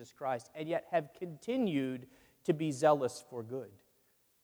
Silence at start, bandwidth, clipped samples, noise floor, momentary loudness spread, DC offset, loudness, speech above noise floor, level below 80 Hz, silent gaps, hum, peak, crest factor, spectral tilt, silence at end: 0 s; over 20 kHz; under 0.1%; -72 dBFS; 15 LU; under 0.1%; -35 LUFS; 38 dB; -78 dBFS; none; none; -14 dBFS; 20 dB; -6 dB/octave; 0.7 s